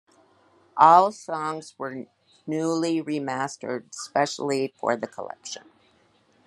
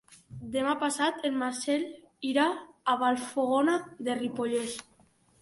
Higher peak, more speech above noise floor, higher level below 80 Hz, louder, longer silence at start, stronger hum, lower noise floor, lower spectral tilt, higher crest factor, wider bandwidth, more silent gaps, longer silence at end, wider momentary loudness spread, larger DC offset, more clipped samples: first, -2 dBFS vs -12 dBFS; about the same, 38 dB vs 35 dB; second, -78 dBFS vs -68 dBFS; first, -24 LUFS vs -30 LUFS; first, 0.75 s vs 0.1 s; neither; about the same, -62 dBFS vs -64 dBFS; about the same, -4.5 dB/octave vs -3.5 dB/octave; first, 24 dB vs 18 dB; about the same, 12 kHz vs 11.5 kHz; neither; first, 0.85 s vs 0.6 s; first, 20 LU vs 11 LU; neither; neither